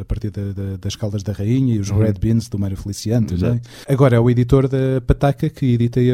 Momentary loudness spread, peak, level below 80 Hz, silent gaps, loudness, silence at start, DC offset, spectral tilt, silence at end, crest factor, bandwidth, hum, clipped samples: 11 LU; 0 dBFS; -32 dBFS; none; -18 LUFS; 0 s; under 0.1%; -8 dB/octave; 0 s; 16 dB; 14 kHz; none; under 0.1%